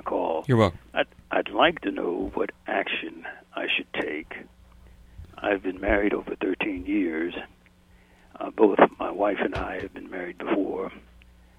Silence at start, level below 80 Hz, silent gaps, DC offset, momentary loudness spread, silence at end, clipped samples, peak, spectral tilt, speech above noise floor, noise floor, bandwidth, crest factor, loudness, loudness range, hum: 0.05 s; -48 dBFS; none; under 0.1%; 15 LU; 0.6 s; under 0.1%; -2 dBFS; -7 dB/octave; 30 dB; -56 dBFS; 11 kHz; 26 dB; -26 LUFS; 4 LU; none